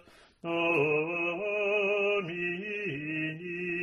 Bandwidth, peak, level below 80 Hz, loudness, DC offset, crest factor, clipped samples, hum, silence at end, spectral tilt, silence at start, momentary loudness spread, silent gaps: 10.5 kHz; -16 dBFS; -72 dBFS; -30 LUFS; under 0.1%; 14 dB; under 0.1%; none; 0 s; -6.5 dB/octave; 0.45 s; 8 LU; none